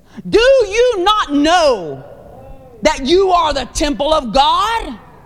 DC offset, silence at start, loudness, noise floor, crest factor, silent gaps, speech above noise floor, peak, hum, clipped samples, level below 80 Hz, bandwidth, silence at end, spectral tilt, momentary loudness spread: 0.4%; 0.15 s; -13 LUFS; -36 dBFS; 14 dB; none; 23 dB; 0 dBFS; none; under 0.1%; -32 dBFS; 14 kHz; 0.3 s; -3.5 dB/octave; 9 LU